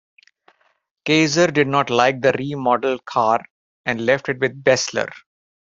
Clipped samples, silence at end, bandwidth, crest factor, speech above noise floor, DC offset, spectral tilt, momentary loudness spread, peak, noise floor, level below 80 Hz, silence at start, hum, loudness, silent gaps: under 0.1%; 0.6 s; 7.8 kHz; 20 dB; 47 dB; under 0.1%; -4.5 dB/octave; 9 LU; 0 dBFS; -65 dBFS; -60 dBFS; 1.05 s; none; -19 LUFS; 3.50-3.84 s